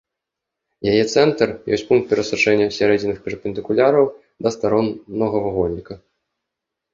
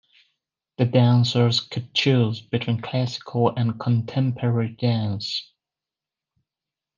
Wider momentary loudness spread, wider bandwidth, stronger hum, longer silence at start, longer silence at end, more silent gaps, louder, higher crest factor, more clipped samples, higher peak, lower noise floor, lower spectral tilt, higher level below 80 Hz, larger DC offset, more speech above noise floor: about the same, 10 LU vs 8 LU; about the same, 7.6 kHz vs 7.4 kHz; neither; about the same, 0.8 s vs 0.8 s; second, 0.95 s vs 1.55 s; neither; first, -19 LUFS vs -22 LUFS; about the same, 18 dB vs 18 dB; neither; about the same, -2 dBFS vs -4 dBFS; second, -83 dBFS vs -89 dBFS; about the same, -5.5 dB/octave vs -6.5 dB/octave; first, -50 dBFS vs -66 dBFS; neither; about the same, 65 dB vs 67 dB